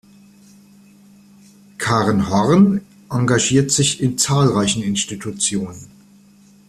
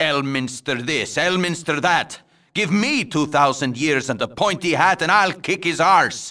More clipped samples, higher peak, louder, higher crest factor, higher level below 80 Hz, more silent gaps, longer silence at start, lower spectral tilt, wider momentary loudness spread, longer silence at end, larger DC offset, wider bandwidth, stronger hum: neither; about the same, -2 dBFS vs -2 dBFS; about the same, -17 LUFS vs -19 LUFS; about the same, 16 dB vs 18 dB; first, -50 dBFS vs -58 dBFS; neither; first, 1.8 s vs 0 s; about the same, -4.5 dB/octave vs -4 dB/octave; about the same, 11 LU vs 9 LU; first, 0.85 s vs 0 s; neither; first, 13.5 kHz vs 11 kHz; neither